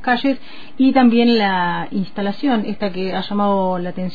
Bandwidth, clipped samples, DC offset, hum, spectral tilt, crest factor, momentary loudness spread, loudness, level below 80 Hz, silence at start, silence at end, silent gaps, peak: 5 kHz; under 0.1%; 4%; none; -8 dB/octave; 16 dB; 11 LU; -18 LUFS; -54 dBFS; 0.05 s; 0 s; none; -2 dBFS